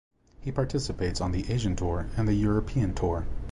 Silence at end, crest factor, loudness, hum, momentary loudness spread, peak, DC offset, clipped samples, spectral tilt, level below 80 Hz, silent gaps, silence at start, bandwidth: 0 s; 14 dB; -29 LUFS; none; 5 LU; -14 dBFS; under 0.1%; under 0.1%; -6.5 dB/octave; -36 dBFS; none; 0.4 s; 11.5 kHz